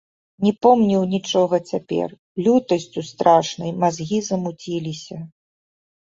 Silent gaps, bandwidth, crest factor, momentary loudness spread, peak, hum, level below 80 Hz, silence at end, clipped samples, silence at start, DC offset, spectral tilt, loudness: 2.19-2.35 s; 7.8 kHz; 18 dB; 14 LU; -2 dBFS; none; -60 dBFS; 0.85 s; under 0.1%; 0.4 s; under 0.1%; -6 dB/octave; -20 LUFS